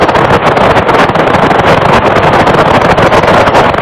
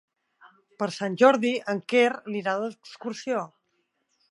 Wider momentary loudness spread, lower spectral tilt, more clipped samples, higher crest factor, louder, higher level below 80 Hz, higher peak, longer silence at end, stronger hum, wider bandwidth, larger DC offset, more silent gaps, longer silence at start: second, 1 LU vs 15 LU; about the same, -6 dB/octave vs -5 dB/octave; first, 3% vs under 0.1%; second, 6 dB vs 24 dB; first, -6 LUFS vs -25 LUFS; first, -26 dBFS vs -82 dBFS; first, 0 dBFS vs -4 dBFS; second, 0 s vs 0.85 s; neither; first, 14.5 kHz vs 11.5 kHz; first, 1% vs under 0.1%; neither; second, 0 s vs 0.8 s